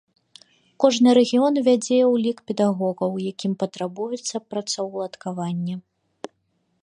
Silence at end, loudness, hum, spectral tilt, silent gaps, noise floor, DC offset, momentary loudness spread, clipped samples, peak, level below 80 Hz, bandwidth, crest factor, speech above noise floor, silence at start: 1.05 s; -22 LUFS; none; -5.5 dB/octave; none; -70 dBFS; under 0.1%; 14 LU; under 0.1%; -4 dBFS; -74 dBFS; 10.5 kHz; 20 dB; 49 dB; 0.8 s